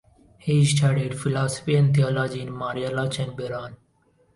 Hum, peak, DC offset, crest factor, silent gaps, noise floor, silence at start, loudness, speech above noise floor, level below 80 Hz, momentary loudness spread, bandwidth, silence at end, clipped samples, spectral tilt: none; -10 dBFS; under 0.1%; 14 dB; none; -63 dBFS; 0.45 s; -23 LUFS; 40 dB; -56 dBFS; 13 LU; 11.5 kHz; 0.6 s; under 0.1%; -6 dB/octave